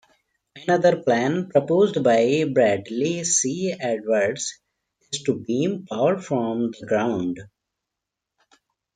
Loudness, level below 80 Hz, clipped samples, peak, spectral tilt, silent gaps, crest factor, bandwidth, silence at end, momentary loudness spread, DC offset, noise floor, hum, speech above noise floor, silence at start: -22 LUFS; -66 dBFS; under 0.1%; -6 dBFS; -4.5 dB/octave; none; 18 dB; 9.6 kHz; 1.5 s; 9 LU; under 0.1%; -84 dBFS; none; 63 dB; 0.55 s